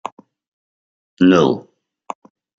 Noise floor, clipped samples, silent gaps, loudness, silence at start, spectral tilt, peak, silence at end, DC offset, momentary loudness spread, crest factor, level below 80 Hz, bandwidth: under -90 dBFS; under 0.1%; none; -15 LUFS; 1.2 s; -6.5 dB/octave; -2 dBFS; 1 s; under 0.1%; 22 LU; 18 dB; -62 dBFS; 7.6 kHz